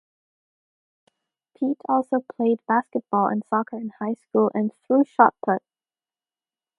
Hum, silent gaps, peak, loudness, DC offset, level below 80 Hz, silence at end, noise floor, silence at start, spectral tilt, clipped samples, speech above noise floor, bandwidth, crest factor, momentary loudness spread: none; none; 0 dBFS; -23 LUFS; under 0.1%; -78 dBFS; 1.2 s; under -90 dBFS; 1.6 s; -9.5 dB/octave; under 0.1%; over 68 dB; 3.7 kHz; 24 dB; 10 LU